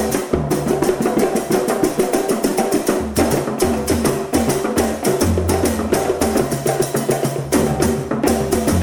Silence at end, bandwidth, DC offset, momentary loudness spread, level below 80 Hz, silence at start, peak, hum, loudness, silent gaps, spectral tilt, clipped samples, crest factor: 0 s; 19.5 kHz; under 0.1%; 2 LU; -34 dBFS; 0 s; -4 dBFS; none; -18 LUFS; none; -5 dB/octave; under 0.1%; 14 dB